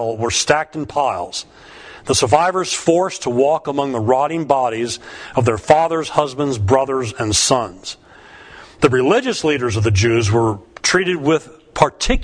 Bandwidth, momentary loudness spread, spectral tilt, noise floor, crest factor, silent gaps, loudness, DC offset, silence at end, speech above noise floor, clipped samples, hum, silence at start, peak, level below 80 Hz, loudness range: 10.5 kHz; 10 LU; -4 dB/octave; -42 dBFS; 18 dB; none; -17 LUFS; under 0.1%; 0 s; 25 dB; under 0.1%; none; 0 s; 0 dBFS; -36 dBFS; 1 LU